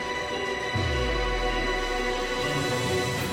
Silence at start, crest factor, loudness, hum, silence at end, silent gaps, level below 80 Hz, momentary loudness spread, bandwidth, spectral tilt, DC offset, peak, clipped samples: 0 s; 12 dB; -27 LUFS; none; 0 s; none; -36 dBFS; 3 LU; 16.5 kHz; -4 dB/octave; under 0.1%; -14 dBFS; under 0.1%